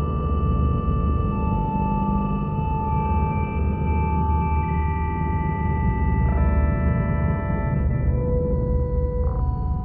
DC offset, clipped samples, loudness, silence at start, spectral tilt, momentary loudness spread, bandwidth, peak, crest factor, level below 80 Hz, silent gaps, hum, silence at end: under 0.1%; under 0.1%; -23 LUFS; 0 s; -12.5 dB/octave; 3 LU; 3.2 kHz; -10 dBFS; 12 dB; -24 dBFS; none; none; 0 s